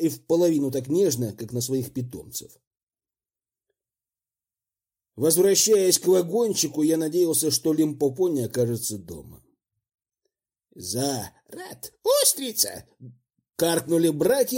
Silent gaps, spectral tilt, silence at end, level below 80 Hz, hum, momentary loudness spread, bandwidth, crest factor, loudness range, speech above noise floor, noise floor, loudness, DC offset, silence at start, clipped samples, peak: 2.67-2.71 s, 2.83-2.87 s; -4 dB/octave; 0 s; -64 dBFS; none; 18 LU; 16.5 kHz; 20 dB; 13 LU; over 67 dB; under -90 dBFS; -23 LUFS; under 0.1%; 0 s; under 0.1%; -4 dBFS